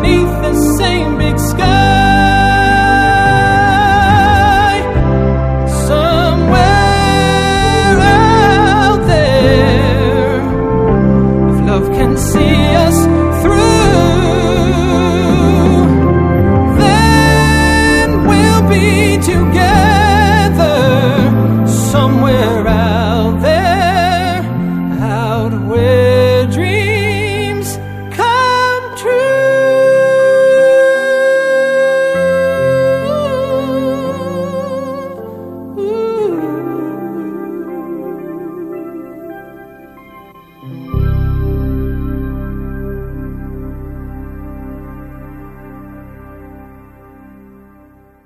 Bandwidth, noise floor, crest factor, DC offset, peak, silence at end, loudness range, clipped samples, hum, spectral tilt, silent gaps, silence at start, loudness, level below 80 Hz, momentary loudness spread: 15.5 kHz; -43 dBFS; 12 dB; under 0.1%; 0 dBFS; 1.6 s; 14 LU; under 0.1%; none; -6 dB/octave; none; 0 s; -11 LUFS; -22 dBFS; 16 LU